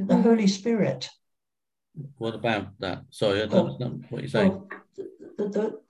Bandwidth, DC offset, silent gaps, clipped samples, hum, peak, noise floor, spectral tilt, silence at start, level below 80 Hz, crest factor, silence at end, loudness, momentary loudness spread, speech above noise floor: 11.5 kHz; under 0.1%; none; under 0.1%; none; -6 dBFS; under -90 dBFS; -6.5 dB/octave; 0 s; -60 dBFS; 20 dB; 0.1 s; -26 LUFS; 19 LU; over 65 dB